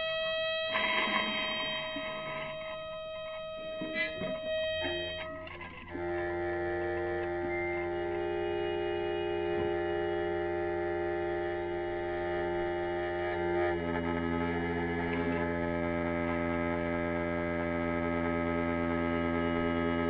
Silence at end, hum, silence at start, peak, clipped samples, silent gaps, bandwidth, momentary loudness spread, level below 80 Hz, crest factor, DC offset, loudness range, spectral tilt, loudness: 0 s; none; 0 s; -16 dBFS; under 0.1%; none; 5.4 kHz; 7 LU; -54 dBFS; 18 dB; under 0.1%; 4 LU; -8.5 dB/octave; -33 LUFS